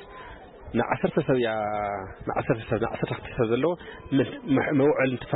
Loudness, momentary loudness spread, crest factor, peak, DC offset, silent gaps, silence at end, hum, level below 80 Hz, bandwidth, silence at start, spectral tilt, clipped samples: -26 LUFS; 11 LU; 14 dB; -12 dBFS; under 0.1%; none; 0 s; none; -50 dBFS; 4.1 kHz; 0 s; -11.5 dB/octave; under 0.1%